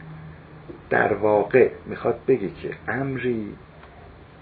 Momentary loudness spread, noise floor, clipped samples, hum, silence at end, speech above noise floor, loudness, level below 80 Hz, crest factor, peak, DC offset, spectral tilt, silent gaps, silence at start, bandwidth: 23 LU; -45 dBFS; under 0.1%; none; 0.3 s; 23 dB; -23 LUFS; -52 dBFS; 20 dB; -4 dBFS; under 0.1%; -11 dB/octave; none; 0 s; 4.6 kHz